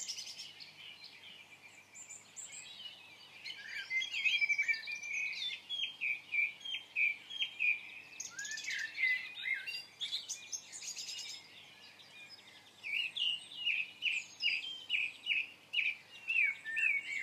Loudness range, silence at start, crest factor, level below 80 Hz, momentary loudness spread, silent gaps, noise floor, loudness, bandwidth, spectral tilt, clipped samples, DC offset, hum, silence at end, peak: 9 LU; 0 s; 18 dB; under -90 dBFS; 20 LU; none; -58 dBFS; -35 LUFS; 15.5 kHz; 2.5 dB/octave; under 0.1%; under 0.1%; none; 0 s; -20 dBFS